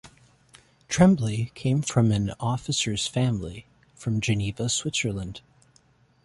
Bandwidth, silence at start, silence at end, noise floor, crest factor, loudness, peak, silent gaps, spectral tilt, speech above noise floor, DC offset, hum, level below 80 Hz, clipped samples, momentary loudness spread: 11.5 kHz; 0.05 s; 0.85 s; -61 dBFS; 20 dB; -25 LUFS; -6 dBFS; none; -5 dB/octave; 37 dB; under 0.1%; none; -50 dBFS; under 0.1%; 15 LU